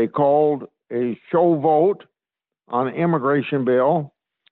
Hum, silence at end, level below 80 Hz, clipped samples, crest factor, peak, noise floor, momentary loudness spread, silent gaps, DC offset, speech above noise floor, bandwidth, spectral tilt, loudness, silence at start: none; 0.45 s; -68 dBFS; under 0.1%; 14 dB; -6 dBFS; -88 dBFS; 11 LU; none; under 0.1%; 69 dB; 4.2 kHz; -11 dB/octave; -20 LUFS; 0 s